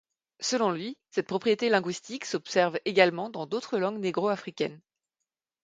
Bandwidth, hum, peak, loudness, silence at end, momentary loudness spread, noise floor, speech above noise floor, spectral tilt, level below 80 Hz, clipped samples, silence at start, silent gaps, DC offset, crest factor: 9.6 kHz; none; -6 dBFS; -28 LUFS; 0.85 s; 10 LU; -87 dBFS; 59 dB; -4 dB/octave; -76 dBFS; under 0.1%; 0.4 s; none; under 0.1%; 24 dB